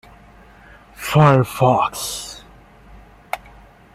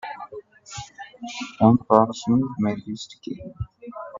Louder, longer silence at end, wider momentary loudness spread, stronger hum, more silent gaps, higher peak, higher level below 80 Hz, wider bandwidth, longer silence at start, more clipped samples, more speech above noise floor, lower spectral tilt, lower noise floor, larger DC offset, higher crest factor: first, -17 LUFS vs -21 LUFS; first, 0.6 s vs 0 s; about the same, 18 LU vs 20 LU; neither; neither; about the same, -2 dBFS vs 0 dBFS; about the same, -48 dBFS vs -52 dBFS; first, 15.5 kHz vs 7.6 kHz; first, 1 s vs 0.05 s; neither; first, 30 dB vs 19 dB; about the same, -6 dB/octave vs -7 dB/octave; first, -46 dBFS vs -41 dBFS; neither; about the same, 20 dB vs 24 dB